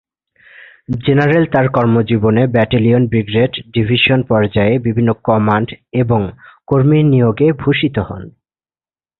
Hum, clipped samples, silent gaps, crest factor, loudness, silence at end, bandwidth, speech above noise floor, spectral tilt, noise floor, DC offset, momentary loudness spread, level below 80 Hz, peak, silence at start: none; under 0.1%; none; 14 dB; -14 LUFS; 0.9 s; 4.3 kHz; over 77 dB; -10 dB/octave; under -90 dBFS; under 0.1%; 7 LU; -40 dBFS; 0 dBFS; 0.9 s